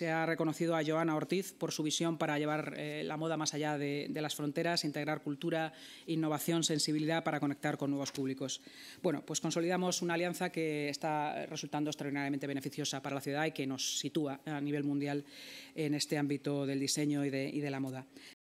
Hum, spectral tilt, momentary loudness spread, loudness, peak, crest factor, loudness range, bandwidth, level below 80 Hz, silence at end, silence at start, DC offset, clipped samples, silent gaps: none; -4.5 dB/octave; 7 LU; -36 LUFS; -18 dBFS; 16 dB; 2 LU; 16 kHz; -86 dBFS; 0.2 s; 0 s; under 0.1%; under 0.1%; none